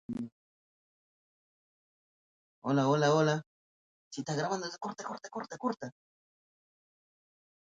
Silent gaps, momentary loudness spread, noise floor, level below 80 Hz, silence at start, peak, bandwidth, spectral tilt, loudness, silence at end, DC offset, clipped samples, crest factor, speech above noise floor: 0.32-2.62 s, 3.46-4.11 s; 16 LU; under -90 dBFS; -76 dBFS; 0.1 s; -16 dBFS; 9.2 kHz; -5.5 dB/octave; -33 LUFS; 1.75 s; under 0.1%; under 0.1%; 20 dB; over 58 dB